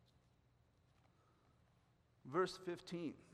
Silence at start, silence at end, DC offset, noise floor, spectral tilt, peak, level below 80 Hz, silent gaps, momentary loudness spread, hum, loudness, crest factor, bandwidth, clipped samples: 2.25 s; 0 s; under 0.1%; -75 dBFS; -5.5 dB/octave; -26 dBFS; -82 dBFS; none; 8 LU; none; -44 LUFS; 24 dB; 13 kHz; under 0.1%